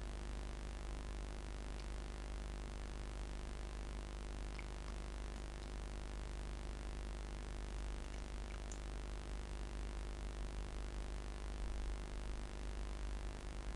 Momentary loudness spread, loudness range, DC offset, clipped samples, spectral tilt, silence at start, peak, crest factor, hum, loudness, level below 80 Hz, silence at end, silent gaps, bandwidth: 1 LU; 1 LU; under 0.1%; under 0.1%; -5 dB/octave; 0 s; -30 dBFS; 14 dB; none; -49 LUFS; -46 dBFS; 0 s; none; 11.5 kHz